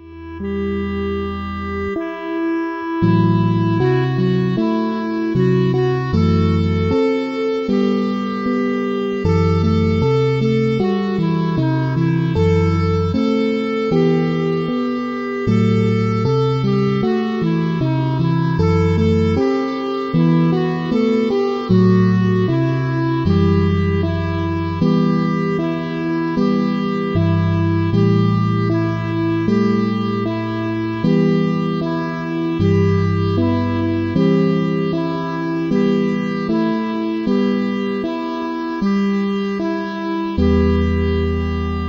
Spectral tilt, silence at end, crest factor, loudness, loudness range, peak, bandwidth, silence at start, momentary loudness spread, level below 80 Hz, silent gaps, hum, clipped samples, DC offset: -8.5 dB/octave; 0 s; 14 dB; -18 LUFS; 3 LU; -2 dBFS; 7.2 kHz; 0 s; 6 LU; -38 dBFS; none; none; under 0.1%; under 0.1%